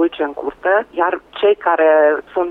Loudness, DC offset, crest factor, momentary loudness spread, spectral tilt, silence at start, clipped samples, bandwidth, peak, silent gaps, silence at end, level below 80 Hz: -16 LUFS; under 0.1%; 12 dB; 10 LU; -6 dB/octave; 0 s; under 0.1%; 4.1 kHz; -4 dBFS; none; 0 s; -56 dBFS